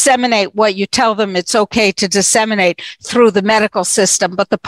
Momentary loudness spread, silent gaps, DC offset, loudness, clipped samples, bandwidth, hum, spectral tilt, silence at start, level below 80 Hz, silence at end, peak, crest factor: 4 LU; none; under 0.1%; -13 LUFS; under 0.1%; 16 kHz; none; -2.5 dB/octave; 0 s; -52 dBFS; 0 s; 0 dBFS; 12 dB